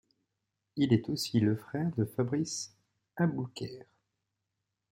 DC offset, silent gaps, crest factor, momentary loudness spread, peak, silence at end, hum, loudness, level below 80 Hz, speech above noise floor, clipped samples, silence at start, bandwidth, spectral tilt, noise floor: under 0.1%; none; 20 dB; 15 LU; -12 dBFS; 1.1 s; none; -32 LUFS; -70 dBFS; 54 dB; under 0.1%; 0.75 s; 16.5 kHz; -6 dB/octave; -85 dBFS